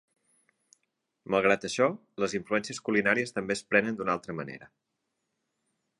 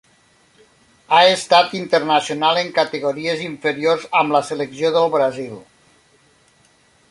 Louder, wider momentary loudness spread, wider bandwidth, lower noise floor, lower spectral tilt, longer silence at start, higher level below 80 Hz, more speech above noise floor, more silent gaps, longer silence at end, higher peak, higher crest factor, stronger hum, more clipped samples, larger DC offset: second, -28 LUFS vs -17 LUFS; about the same, 10 LU vs 10 LU; about the same, 11.5 kHz vs 11.5 kHz; first, -81 dBFS vs -56 dBFS; about the same, -4.5 dB/octave vs -3.5 dB/octave; first, 1.3 s vs 1.1 s; about the same, -68 dBFS vs -64 dBFS; first, 53 dB vs 38 dB; neither; second, 1.35 s vs 1.5 s; second, -8 dBFS vs -2 dBFS; about the same, 22 dB vs 18 dB; neither; neither; neither